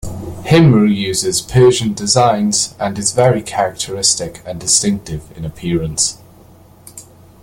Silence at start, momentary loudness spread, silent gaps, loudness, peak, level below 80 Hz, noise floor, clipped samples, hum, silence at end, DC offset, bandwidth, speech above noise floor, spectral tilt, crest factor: 0.05 s; 14 LU; none; -14 LUFS; 0 dBFS; -40 dBFS; -43 dBFS; under 0.1%; none; 0.4 s; under 0.1%; 17 kHz; 29 dB; -4.5 dB/octave; 16 dB